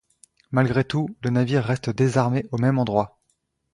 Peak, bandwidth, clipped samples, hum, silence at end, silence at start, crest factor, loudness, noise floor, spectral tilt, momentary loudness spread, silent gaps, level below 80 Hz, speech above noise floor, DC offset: -4 dBFS; 11 kHz; under 0.1%; none; 0.65 s; 0.5 s; 18 dB; -23 LUFS; -72 dBFS; -7.5 dB/octave; 5 LU; none; -54 dBFS; 50 dB; under 0.1%